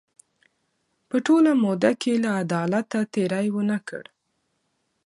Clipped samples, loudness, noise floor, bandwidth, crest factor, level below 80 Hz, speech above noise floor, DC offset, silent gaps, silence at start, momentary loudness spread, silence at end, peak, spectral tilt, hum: under 0.1%; -23 LUFS; -74 dBFS; 11.5 kHz; 18 dB; -72 dBFS; 52 dB; under 0.1%; none; 1.15 s; 10 LU; 1.05 s; -6 dBFS; -6.5 dB/octave; none